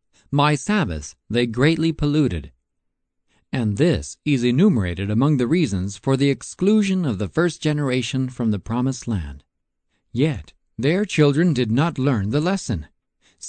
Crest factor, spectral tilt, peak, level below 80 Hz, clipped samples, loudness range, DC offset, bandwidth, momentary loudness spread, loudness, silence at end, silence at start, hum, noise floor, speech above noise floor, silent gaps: 16 dB; -6.5 dB/octave; -4 dBFS; -42 dBFS; under 0.1%; 4 LU; under 0.1%; 9.2 kHz; 9 LU; -21 LUFS; 0 s; 0.3 s; none; -75 dBFS; 55 dB; none